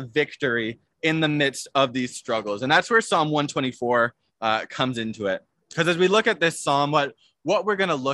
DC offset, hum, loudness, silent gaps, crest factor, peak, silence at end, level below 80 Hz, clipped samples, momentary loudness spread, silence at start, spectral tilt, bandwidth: under 0.1%; none; -23 LUFS; none; 20 dB; -4 dBFS; 0 s; -66 dBFS; under 0.1%; 9 LU; 0 s; -4.5 dB/octave; 12.5 kHz